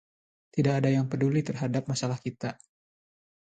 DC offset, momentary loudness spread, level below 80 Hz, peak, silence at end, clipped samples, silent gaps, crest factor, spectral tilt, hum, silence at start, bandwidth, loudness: under 0.1%; 10 LU; -66 dBFS; -12 dBFS; 1.05 s; under 0.1%; none; 16 dB; -6.5 dB/octave; none; 0.55 s; 9.2 kHz; -29 LUFS